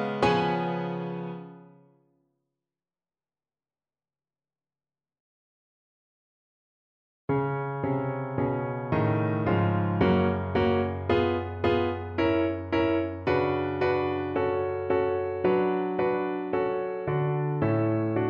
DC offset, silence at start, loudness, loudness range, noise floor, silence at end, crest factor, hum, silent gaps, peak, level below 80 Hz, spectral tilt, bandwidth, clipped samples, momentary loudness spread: under 0.1%; 0 s; -27 LUFS; 10 LU; under -90 dBFS; 0 s; 18 dB; none; 5.20-7.28 s; -10 dBFS; -54 dBFS; -8.5 dB/octave; 7.6 kHz; under 0.1%; 6 LU